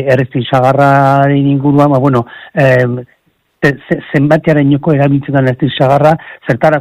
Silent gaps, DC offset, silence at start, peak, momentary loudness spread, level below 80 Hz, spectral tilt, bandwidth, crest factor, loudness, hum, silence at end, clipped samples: none; under 0.1%; 0 s; 0 dBFS; 7 LU; -46 dBFS; -8.5 dB/octave; 8.8 kHz; 10 dB; -10 LUFS; none; 0 s; 0.4%